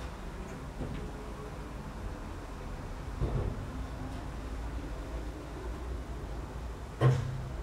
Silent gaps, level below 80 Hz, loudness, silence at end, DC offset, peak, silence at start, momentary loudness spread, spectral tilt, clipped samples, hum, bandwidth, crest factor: none; -42 dBFS; -38 LUFS; 0 s; under 0.1%; -14 dBFS; 0 s; 11 LU; -7 dB/octave; under 0.1%; none; 13.5 kHz; 22 dB